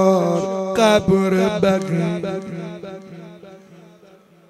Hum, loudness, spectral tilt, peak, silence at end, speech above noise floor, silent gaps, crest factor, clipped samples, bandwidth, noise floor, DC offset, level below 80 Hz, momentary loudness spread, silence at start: none; -18 LUFS; -6 dB/octave; -2 dBFS; 0.7 s; 32 dB; none; 18 dB; under 0.1%; 13.5 kHz; -49 dBFS; under 0.1%; -52 dBFS; 21 LU; 0 s